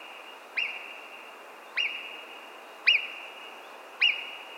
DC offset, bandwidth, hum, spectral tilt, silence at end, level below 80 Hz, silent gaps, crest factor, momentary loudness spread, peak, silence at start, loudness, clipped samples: under 0.1%; 17 kHz; none; 1.5 dB/octave; 0 s; under -90 dBFS; none; 24 dB; 22 LU; -10 dBFS; 0 s; -27 LUFS; under 0.1%